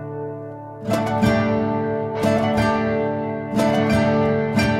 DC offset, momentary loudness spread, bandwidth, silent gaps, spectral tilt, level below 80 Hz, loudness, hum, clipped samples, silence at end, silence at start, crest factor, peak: under 0.1%; 12 LU; 15 kHz; none; -7 dB/octave; -44 dBFS; -20 LUFS; none; under 0.1%; 0 s; 0 s; 14 dB; -6 dBFS